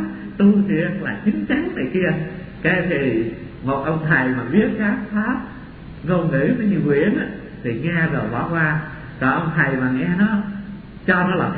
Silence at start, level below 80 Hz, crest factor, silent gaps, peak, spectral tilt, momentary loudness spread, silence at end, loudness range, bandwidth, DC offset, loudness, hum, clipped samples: 0 s; -44 dBFS; 18 dB; none; -2 dBFS; -11.5 dB/octave; 11 LU; 0 s; 1 LU; 4.6 kHz; under 0.1%; -20 LUFS; none; under 0.1%